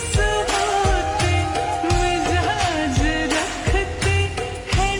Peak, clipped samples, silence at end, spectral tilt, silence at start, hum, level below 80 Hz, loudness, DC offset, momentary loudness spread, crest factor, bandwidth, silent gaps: -6 dBFS; under 0.1%; 0 s; -4.5 dB/octave; 0 s; none; -28 dBFS; -20 LUFS; under 0.1%; 3 LU; 14 dB; 18.5 kHz; none